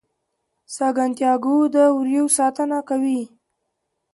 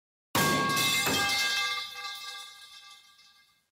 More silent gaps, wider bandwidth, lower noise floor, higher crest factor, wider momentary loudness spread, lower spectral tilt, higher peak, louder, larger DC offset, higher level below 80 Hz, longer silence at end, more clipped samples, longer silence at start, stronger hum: neither; second, 12 kHz vs 16 kHz; first, -76 dBFS vs -62 dBFS; about the same, 16 dB vs 16 dB; second, 8 LU vs 21 LU; about the same, -3 dB/octave vs -2 dB/octave; first, -4 dBFS vs -16 dBFS; first, -19 LUFS vs -27 LUFS; neither; second, -74 dBFS vs -64 dBFS; about the same, 0.85 s vs 0.75 s; neither; first, 0.7 s vs 0.35 s; neither